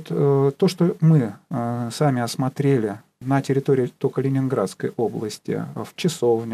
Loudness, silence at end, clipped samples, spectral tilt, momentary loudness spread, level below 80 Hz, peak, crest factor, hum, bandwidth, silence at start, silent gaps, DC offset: -22 LUFS; 0 s; under 0.1%; -7 dB/octave; 9 LU; -68 dBFS; -8 dBFS; 14 dB; none; 14.5 kHz; 0 s; none; under 0.1%